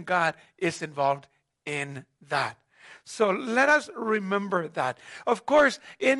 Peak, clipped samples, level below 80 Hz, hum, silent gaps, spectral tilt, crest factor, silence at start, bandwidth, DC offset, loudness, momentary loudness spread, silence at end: -8 dBFS; under 0.1%; -70 dBFS; none; none; -4.5 dB/octave; 18 dB; 0 s; 11.5 kHz; under 0.1%; -26 LUFS; 13 LU; 0 s